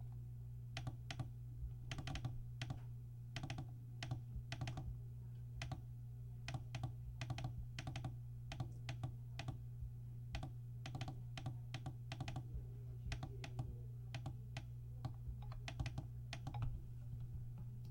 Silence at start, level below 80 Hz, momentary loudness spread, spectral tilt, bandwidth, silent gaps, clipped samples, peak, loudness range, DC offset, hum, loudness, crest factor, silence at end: 0 s; -56 dBFS; 5 LU; -5.5 dB/octave; 16.5 kHz; none; under 0.1%; -30 dBFS; 1 LU; under 0.1%; 60 Hz at -50 dBFS; -50 LUFS; 18 dB; 0 s